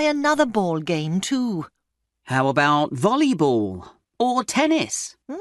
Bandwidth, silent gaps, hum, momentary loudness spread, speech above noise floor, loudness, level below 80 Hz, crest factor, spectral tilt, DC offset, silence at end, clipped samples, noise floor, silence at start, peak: 12 kHz; none; none; 10 LU; 54 dB; -21 LUFS; -62 dBFS; 16 dB; -4.5 dB/octave; under 0.1%; 0 s; under 0.1%; -75 dBFS; 0 s; -6 dBFS